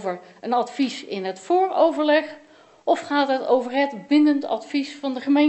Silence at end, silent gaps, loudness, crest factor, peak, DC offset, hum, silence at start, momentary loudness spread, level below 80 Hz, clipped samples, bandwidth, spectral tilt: 0 s; none; -22 LUFS; 16 dB; -6 dBFS; under 0.1%; none; 0 s; 11 LU; -76 dBFS; under 0.1%; 8.4 kHz; -4.5 dB/octave